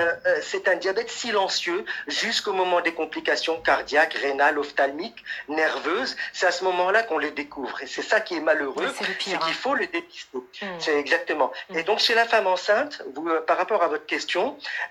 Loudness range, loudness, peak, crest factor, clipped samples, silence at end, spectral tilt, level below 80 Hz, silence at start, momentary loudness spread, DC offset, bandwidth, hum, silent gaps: 3 LU; -24 LUFS; -6 dBFS; 18 dB; under 0.1%; 0 s; -2 dB/octave; -66 dBFS; 0 s; 10 LU; under 0.1%; 14 kHz; none; none